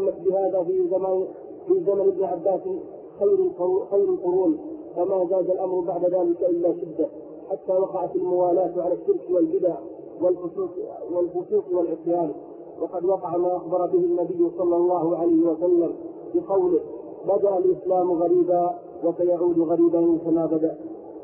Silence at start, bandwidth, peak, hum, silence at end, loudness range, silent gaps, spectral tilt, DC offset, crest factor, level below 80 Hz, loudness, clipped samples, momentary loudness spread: 0 s; 2.7 kHz; -10 dBFS; none; 0 s; 3 LU; none; -13.5 dB/octave; under 0.1%; 12 dB; -66 dBFS; -23 LUFS; under 0.1%; 10 LU